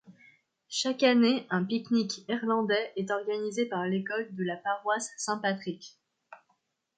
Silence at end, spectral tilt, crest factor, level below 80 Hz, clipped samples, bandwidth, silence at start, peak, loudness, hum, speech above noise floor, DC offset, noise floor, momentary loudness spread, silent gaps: 0.6 s; -4.5 dB/octave; 20 dB; -80 dBFS; under 0.1%; 9.4 kHz; 0.1 s; -10 dBFS; -29 LUFS; none; 46 dB; under 0.1%; -75 dBFS; 10 LU; none